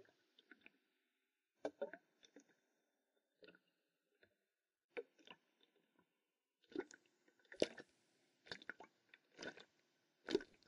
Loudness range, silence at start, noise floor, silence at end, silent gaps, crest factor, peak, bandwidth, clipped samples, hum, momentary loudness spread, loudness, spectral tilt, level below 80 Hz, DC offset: 11 LU; 1.65 s; under -90 dBFS; 0.2 s; 4.84-4.89 s; 34 dB; -20 dBFS; 10.5 kHz; under 0.1%; none; 23 LU; -50 LUFS; -3.5 dB/octave; -88 dBFS; under 0.1%